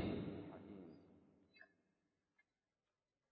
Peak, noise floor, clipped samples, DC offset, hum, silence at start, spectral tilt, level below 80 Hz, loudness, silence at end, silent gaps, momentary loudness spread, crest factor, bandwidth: -32 dBFS; under -90 dBFS; under 0.1%; under 0.1%; none; 0 s; -6.5 dB/octave; -70 dBFS; -52 LUFS; 1.65 s; none; 21 LU; 22 dB; 4.9 kHz